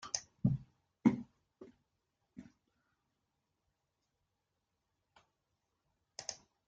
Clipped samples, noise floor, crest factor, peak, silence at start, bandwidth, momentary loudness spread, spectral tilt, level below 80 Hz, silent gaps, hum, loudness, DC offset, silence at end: under 0.1%; -86 dBFS; 28 dB; -14 dBFS; 0.05 s; 9 kHz; 24 LU; -5 dB/octave; -68 dBFS; none; none; -38 LUFS; under 0.1%; 0.35 s